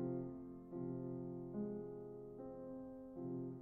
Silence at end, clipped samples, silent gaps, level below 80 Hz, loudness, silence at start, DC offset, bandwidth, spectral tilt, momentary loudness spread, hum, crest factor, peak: 0 s; under 0.1%; none; -72 dBFS; -49 LUFS; 0 s; under 0.1%; 2.3 kHz; -10.5 dB/octave; 7 LU; none; 14 dB; -32 dBFS